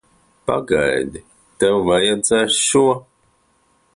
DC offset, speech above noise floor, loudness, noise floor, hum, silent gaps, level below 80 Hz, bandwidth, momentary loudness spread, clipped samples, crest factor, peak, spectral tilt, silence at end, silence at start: under 0.1%; 44 dB; -17 LUFS; -60 dBFS; none; none; -48 dBFS; 11.5 kHz; 10 LU; under 0.1%; 14 dB; -4 dBFS; -3 dB/octave; 0.95 s; 0.45 s